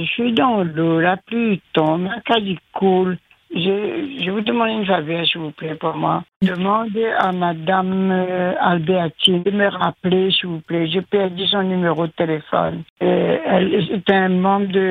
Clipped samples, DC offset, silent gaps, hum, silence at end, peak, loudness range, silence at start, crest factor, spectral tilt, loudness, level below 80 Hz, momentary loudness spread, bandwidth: under 0.1%; under 0.1%; 6.36-6.40 s, 12.90-12.96 s; none; 0 s; 0 dBFS; 2 LU; 0 s; 18 dB; -7 dB/octave; -18 LUFS; -58 dBFS; 6 LU; 9.8 kHz